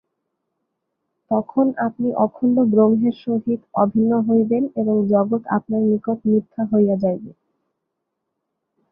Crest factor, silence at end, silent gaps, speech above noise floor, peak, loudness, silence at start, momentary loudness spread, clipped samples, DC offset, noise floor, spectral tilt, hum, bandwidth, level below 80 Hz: 16 dB; 1.6 s; none; 60 dB; -4 dBFS; -19 LUFS; 1.3 s; 6 LU; under 0.1%; under 0.1%; -78 dBFS; -12.5 dB/octave; none; 3.7 kHz; -62 dBFS